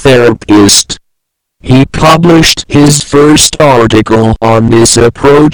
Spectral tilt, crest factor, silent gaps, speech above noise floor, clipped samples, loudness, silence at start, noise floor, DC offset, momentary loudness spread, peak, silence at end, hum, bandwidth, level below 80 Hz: -4.5 dB/octave; 6 dB; none; 62 dB; 10%; -5 LUFS; 0 s; -67 dBFS; 2%; 4 LU; 0 dBFS; 0 s; none; over 20 kHz; -26 dBFS